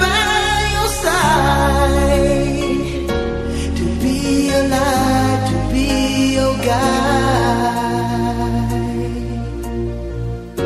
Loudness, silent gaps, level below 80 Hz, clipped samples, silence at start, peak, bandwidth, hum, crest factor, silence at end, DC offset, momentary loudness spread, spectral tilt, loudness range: -17 LUFS; none; -26 dBFS; under 0.1%; 0 s; -2 dBFS; 14.5 kHz; none; 14 dB; 0 s; under 0.1%; 9 LU; -5 dB/octave; 3 LU